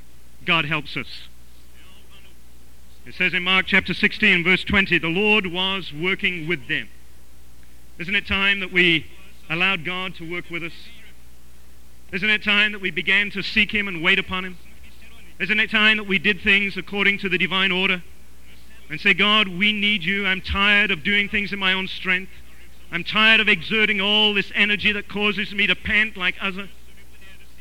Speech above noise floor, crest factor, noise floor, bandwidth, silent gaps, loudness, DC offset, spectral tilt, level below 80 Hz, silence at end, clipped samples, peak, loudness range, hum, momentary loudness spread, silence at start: 29 dB; 18 dB; -50 dBFS; 17 kHz; none; -19 LUFS; 2%; -4.5 dB/octave; -46 dBFS; 0.25 s; under 0.1%; -4 dBFS; 5 LU; none; 13 LU; 0.4 s